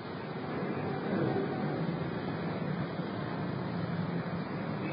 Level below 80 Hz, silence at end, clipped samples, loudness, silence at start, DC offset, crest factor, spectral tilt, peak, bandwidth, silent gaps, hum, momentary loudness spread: -60 dBFS; 0 s; under 0.1%; -35 LUFS; 0 s; under 0.1%; 14 dB; -6.5 dB/octave; -20 dBFS; 5 kHz; none; none; 4 LU